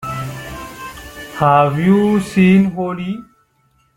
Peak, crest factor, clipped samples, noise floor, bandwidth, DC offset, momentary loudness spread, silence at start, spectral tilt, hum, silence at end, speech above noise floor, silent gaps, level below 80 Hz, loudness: 0 dBFS; 16 dB; under 0.1%; -59 dBFS; 16 kHz; under 0.1%; 19 LU; 0 s; -7.5 dB/octave; none; 0.75 s; 46 dB; none; -44 dBFS; -15 LUFS